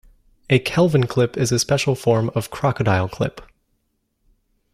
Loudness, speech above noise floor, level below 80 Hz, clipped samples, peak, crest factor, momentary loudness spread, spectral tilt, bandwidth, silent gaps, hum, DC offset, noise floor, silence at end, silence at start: -20 LUFS; 51 dB; -50 dBFS; under 0.1%; -2 dBFS; 18 dB; 7 LU; -5.5 dB/octave; 15 kHz; none; none; under 0.1%; -70 dBFS; 1.3 s; 0.5 s